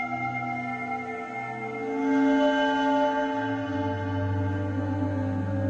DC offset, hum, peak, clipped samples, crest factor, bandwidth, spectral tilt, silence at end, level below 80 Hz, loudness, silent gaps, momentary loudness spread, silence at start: under 0.1%; none; -14 dBFS; under 0.1%; 14 dB; 7.8 kHz; -7.5 dB/octave; 0 s; -60 dBFS; -27 LUFS; none; 10 LU; 0 s